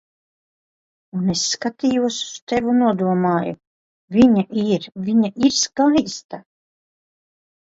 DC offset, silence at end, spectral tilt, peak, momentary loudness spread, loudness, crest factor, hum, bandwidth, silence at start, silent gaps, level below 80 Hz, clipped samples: under 0.1%; 1.25 s; -4.5 dB/octave; -2 dBFS; 14 LU; -19 LUFS; 18 dB; none; 8 kHz; 1.15 s; 2.42-2.47 s, 3.67-4.08 s, 6.24-6.29 s; -54 dBFS; under 0.1%